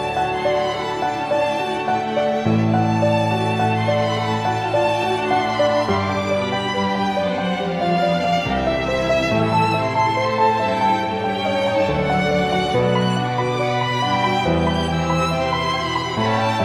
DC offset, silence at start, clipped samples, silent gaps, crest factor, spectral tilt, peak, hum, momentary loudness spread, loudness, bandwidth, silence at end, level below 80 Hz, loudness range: under 0.1%; 0 s; under 0.1%; none; 14 dB; -6 dB/octave; -6 dBFS; none; 3 LU; -19 LUFS; 14 kHz; 0 s; -42 dBFS; 1 LU